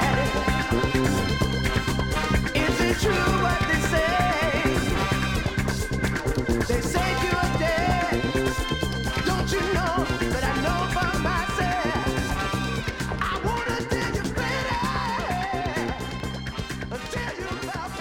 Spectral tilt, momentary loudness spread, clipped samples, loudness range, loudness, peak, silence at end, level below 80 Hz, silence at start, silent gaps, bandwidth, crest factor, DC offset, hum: -5 dB/octave; 8 LU; under 0.1%; 4 LU; -25 LUFS; -8 dBFS; 0 s; -34 dBFS; 0 s; none; 17.5 kHz; 16 dB; under 0.1%; none